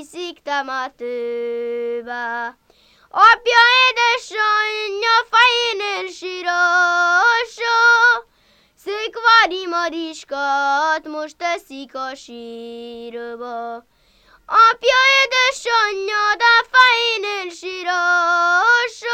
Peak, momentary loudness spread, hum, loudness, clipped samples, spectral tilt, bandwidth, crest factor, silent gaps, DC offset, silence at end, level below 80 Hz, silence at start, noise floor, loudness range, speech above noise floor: 0 dBFS; 18 LU; none; -16 LUFS; under 0.1%; 0.5 dB/octave; 14.5 kHz; 18 dB; none; under 0.1%; 0 s; -60 dBFS; 0 s; -57 dBFS; 9 LU; 39 dB